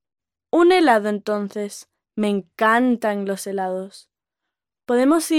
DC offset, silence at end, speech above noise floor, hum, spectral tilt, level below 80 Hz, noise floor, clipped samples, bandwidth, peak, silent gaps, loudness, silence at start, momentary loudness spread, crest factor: under 0.1%; 0 s; 65 dB; none; -4.5 dB/octave; -68 dBFS; -84 dBFS; under 0.1%; 16 kHz; -4 dBFS; none; -20 LUFS; 0.55 s; 15 LU; 16 dB